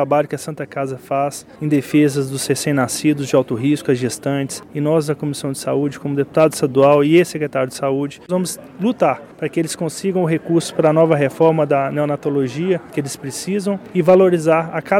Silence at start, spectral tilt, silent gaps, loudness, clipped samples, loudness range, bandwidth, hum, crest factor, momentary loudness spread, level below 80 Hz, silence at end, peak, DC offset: 0 s; -6 dB/octave; none; -18 LUFS; under 0.1%; 3 LU; 16.5 kHz; none; 16 dB; 10 LU; -58 dBFS; 0 s; -2 dBFS; under 0.1%